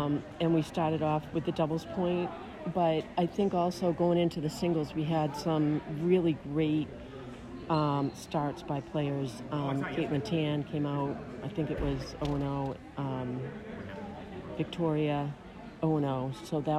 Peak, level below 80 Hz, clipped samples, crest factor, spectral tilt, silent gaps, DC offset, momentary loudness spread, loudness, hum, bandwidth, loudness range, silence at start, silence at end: -14 dBFS; -54 dBFS; under 0.1%; 16 dB; -7.5 dB/octave; none; under 0.1%; 11 LU; -32 LUFS; none; 13 kHz; 5 LU; 0 s; 0 s